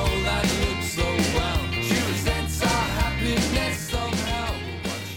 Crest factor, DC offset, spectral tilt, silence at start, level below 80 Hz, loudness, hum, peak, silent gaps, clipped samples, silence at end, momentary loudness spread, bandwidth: 16 dB; under 0.1%; -4 dB/octave; 0 s; -32 dBFS; -24 LUFS; none; -8 dBFS; none; under 0.1%; 0 s; 5 LU; 18.5 kHz